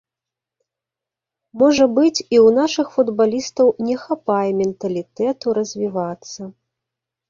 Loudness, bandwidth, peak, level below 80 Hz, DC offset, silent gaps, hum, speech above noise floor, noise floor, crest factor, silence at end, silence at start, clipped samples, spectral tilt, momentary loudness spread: -18 LUFS; 7.4 kHz; -2 dBFS; -60 dBFS; under 0.1%; none; none; 69 dB; -87 dBFS; 16 dB; 0.8 s; 1.55 s; under 0.1%; -5 dB/octave; 12 LU